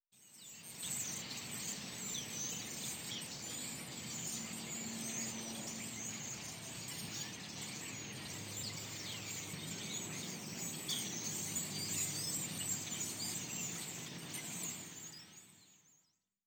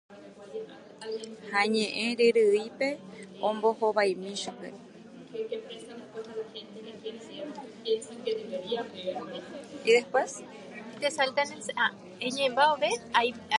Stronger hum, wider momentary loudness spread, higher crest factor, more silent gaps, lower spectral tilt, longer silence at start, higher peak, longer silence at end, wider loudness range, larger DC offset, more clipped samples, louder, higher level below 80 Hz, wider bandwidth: neither; second, 7 LU vs 19 LU; second, 18 dB vs 24 dB; neither; second, -1.5 dB/octave vs -3 dB/octave; about the same, 0.15 s vs 0.1 s; second, -26 dBFS vs -6 dBFS; first, 0.5 s vs 0 s; second, 5 LU vs 10 LU; neither; neither; second, -41 LUFS vs -29 LUFS; about the same, -74 dBFS vs -76 dBFS; first, over 20 kHz vs 11.5 kHz